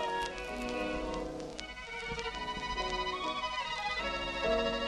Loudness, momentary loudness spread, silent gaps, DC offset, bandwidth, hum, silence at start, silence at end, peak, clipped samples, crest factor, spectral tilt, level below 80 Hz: -36 LUFS; 8 LU; none; under 0.1%; 13 kHz; none; 0 s; 0 s; -16 dBFS; under 0.1%; 20 dB; -3.5 dB/octave; -50 dBFS